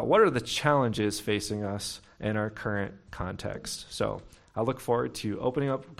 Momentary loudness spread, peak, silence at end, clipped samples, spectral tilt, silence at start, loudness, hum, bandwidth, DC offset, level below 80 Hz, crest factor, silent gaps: 12 LU; -8 dBFS; 0.05 s; under 0.1%; -5 dB/octave; 0 s; -30 LUFS; none; 16 kHz; under 0.1%; -54 dBFS; 20 dB; none